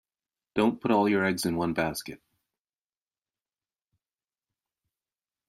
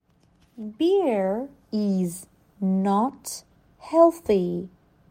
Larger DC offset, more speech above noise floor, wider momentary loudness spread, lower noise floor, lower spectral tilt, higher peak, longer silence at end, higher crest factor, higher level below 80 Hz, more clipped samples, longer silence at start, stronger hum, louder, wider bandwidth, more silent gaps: neither; first, over 64 dB vs 39 dB; second, 11 LU vs 19 LU; first, under -90 dBFS vs -61 dBFS; second, -5.5 dB/octave vs -7 dB/octave; second, -12 dBFS vs -6 dBFS; first, 3.3 s vs 0.45 s; about the same, 20 dB vs 20 dB; about the same, -64 dBFS vs -62 dBFS; neither; about the same, 0.55 s vs 0.6 s; neither; second, -27 LUFS vs -24 LUFS; about the same, 15.5 kHz vs 16.5 kHz; neither